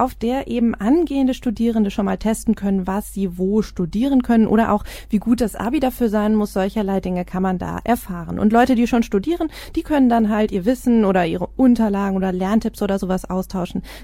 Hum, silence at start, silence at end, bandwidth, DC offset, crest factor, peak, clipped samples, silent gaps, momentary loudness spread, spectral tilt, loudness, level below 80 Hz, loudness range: none; 0 s; 0 s; 16 kHz; under 0.1%; 18 dB; -2 dBFS; under 0.1%; none; 8 LU; -7 dB/octave; -19 LUFS; -38 dBFS; 2 LU